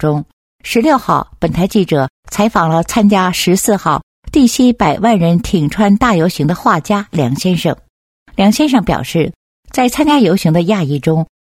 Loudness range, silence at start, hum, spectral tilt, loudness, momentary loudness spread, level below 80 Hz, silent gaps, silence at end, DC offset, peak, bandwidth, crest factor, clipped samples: 2 LU; 0 s; none; -5.5 dB/octave; -13 LUFS; 7 LU; -36 dBFS; 0.33-0.59 s, 2.10-2.23 s, 4.03-4.23 s, 7.90-8.26 s, 9.36-9.63 s; 0.2 s; under 0.1%; 0 dBFS; 16.5 kHz; 12 dB; under 0.1%